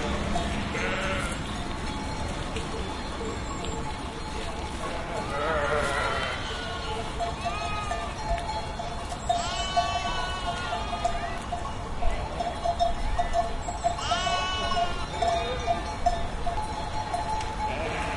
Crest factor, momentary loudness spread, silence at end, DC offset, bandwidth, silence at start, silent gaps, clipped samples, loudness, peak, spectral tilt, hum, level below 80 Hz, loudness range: 18 dB; 7 LU; 0 s; under 0.1%; 11.5 kHz; 0 s; none; under 0.1%; -30 LUFS; -12 dBFS; -4 dB/octave; none; -36 dBFS; 4 LU